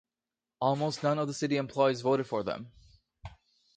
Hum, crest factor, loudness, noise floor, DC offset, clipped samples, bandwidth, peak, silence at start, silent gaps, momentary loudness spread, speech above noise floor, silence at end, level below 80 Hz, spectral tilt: none; 20 dB; -30 LUFS; under -90 dBFS; under 0.1%; under 0.1%; 9.4 kHz; -12 dBFS; 0.6 s; none; 23 LU; over 60 dB; 0.45 s; -64 dBFS; -6 dB/octave